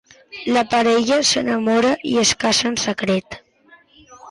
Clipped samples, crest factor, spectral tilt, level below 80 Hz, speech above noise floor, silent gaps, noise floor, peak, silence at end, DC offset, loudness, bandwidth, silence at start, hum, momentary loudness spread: under 0.1%; 14 dB; -3 dB/octave; -54 dBFS; 34 dB; none; -52 dBFS; -6 dBFS; 0 s; under 0.1%; -17 LUFS; 11.5 kHz; 0.3 s; none; 12 LU